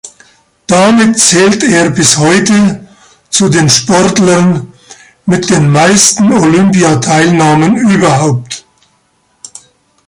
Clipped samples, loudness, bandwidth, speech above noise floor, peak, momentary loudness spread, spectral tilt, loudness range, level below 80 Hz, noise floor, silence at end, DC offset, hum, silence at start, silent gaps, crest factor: 0.2%; -7 LUFS; 16 kHz; 47 dB; 0 dBFS; 8 LU; -4 dB/octave; 3 LU; -44 dBFS; -54 dBFS; 1.5 s; under 0.1%; none; 0.05 s; none; 8 dB